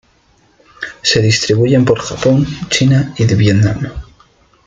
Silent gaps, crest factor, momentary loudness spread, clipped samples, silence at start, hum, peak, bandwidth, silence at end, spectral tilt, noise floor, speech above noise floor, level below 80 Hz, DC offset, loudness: none; 14 dB; 13 LU; under 0.1%; 0.8 s; none; 0 dBFS; 9.2 kHz; 0.65 s; -5.5 dB/octave; -52 dBFS; 41 dB; -38 dBFS; under 0.1%; -13 LUFS